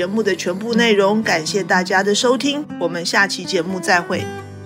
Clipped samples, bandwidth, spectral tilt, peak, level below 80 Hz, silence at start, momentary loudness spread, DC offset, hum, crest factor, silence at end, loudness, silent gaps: under 0.1%; 16 kHz; -3.5 dB/octave; -4 dBFS; -66 dBFS; 0 s; 7 LU; under 0.1%; none; 14 dB; 0 s; -17 LUFS; none